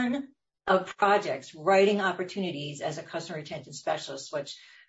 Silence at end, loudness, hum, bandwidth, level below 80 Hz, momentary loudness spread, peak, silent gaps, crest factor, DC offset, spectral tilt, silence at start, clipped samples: 0.3 s; -29 LUFS; none; 8 kHz; -72 dBFS; 15 LU; -10 dBFS; none; 18 dB; under 0.1%; -4.5 dB/octave; 0 s; under 0.1%